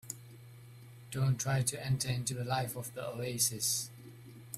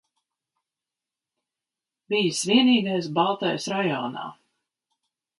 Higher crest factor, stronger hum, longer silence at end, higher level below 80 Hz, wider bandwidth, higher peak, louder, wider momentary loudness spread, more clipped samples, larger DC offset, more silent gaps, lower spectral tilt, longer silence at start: about the same, 20 dB vs 20 dB; neither; second, 0 s vs 1.05 s; first, -64 dBFS vs -74 dBFS; first, 15.5 kHz vs 11.5 kHz; second, -16 dBFS vs -6 dBFS; second, -34 LUFS vs -23 LUFS; first, 22 LU vs 13 LU; neither; neither; neither; about the same, -3.5 dB/octave vs -4 dB/octave; second, 0.05 s vs 2.1 s